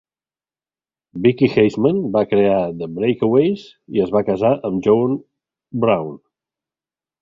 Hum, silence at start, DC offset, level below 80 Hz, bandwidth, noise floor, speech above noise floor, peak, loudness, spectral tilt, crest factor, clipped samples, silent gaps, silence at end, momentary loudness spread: none; 1.15 s; under 0.1%; -54 dBFS; 7.4 kHz; under -90 dBFS; over 73 dB; -2 dBFS; -18 LUFS; -8.5 dB/octave; 16 dB; under 0.1%; none; 1.05 s; 9 LU